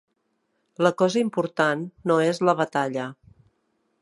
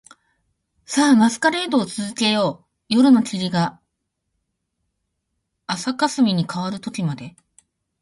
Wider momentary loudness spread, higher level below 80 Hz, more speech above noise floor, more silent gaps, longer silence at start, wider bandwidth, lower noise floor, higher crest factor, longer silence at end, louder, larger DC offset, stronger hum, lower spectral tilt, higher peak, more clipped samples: second, 8 LU vs 12 LU; second, -70 dBFS vs -64 dBFS; second, 50 dB vs 58 dB; neither; about the same, 0.8 s vs 0.9 s; about the same, 11.5 kHz vs 11.5 kHz; about the same, -73 dBFS vs -76 dBFS; about the same, 20 dB vs 18 dB; first, 0.9 s vs 0.75 s; second, -23 LUFS vs -19 LUFS; neither; neither; about the same, -5.5 dB/octave vs -4.5 dB/octave; about the same, -4 dBFS vs -4 dBFS; neither